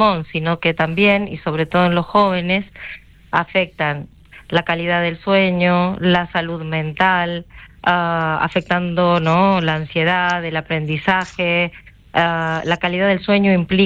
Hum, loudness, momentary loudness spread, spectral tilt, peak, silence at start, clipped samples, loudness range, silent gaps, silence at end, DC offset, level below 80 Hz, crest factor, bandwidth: none; -17 LUFS; 7 LU; -7 dB/octave; -2 dBFS; 0 s; under 0.1%; 2 LU; none; 0 s; under 0.1%; -46 dBFS; 16 dB; 7.6 kHz